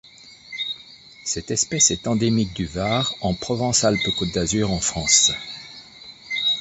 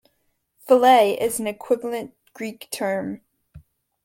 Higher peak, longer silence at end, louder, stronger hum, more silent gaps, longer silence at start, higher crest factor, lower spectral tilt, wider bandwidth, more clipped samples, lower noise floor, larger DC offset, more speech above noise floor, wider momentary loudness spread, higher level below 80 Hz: about the same, -2 dBFS vs -4 dBFS; second, 0 s vs 0.45 s; about the same, -20 LUFS vs -20 LUFS; neither; neither; second, 0.25 s vs 0.65 s; about the same, 20 dB vs 20 dB; about the same, -2.5 dB/octave vs -3.5 dB/octave; second, 8.8 kHz vs 17 kHz; neither; second, -45 dBFS vs -70 dBFS; neither; second, 24 dB vs 50 dB; about the same, 18 LU vs 19 LU; first, -44 dBFS vs -62 dBFS